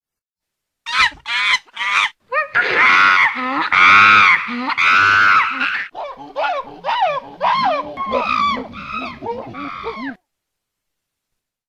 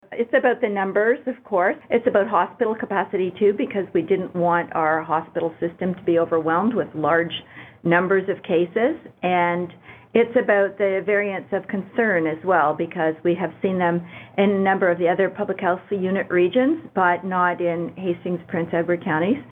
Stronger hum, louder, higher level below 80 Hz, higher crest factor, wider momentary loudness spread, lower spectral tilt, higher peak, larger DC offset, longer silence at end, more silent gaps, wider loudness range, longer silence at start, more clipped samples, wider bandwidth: neither; first, -14 LUFS vs -21 LUFS; first, -54 dBFS vs -66 dBFS; about the same, 16 dB vs 18 dB; first, 18 LU vs 7 LU; second, -2.5 dB/octave vs -9 dB/octave; about the same, 0 dBFS vs -2 dBFS; neither; first, 1.55 s vs 0.05 s; neither; first, 12 LU vs 1 LU; first, 0.85 s vs 0.1 s; neither; first, 11.5 kHz vs 4 kHz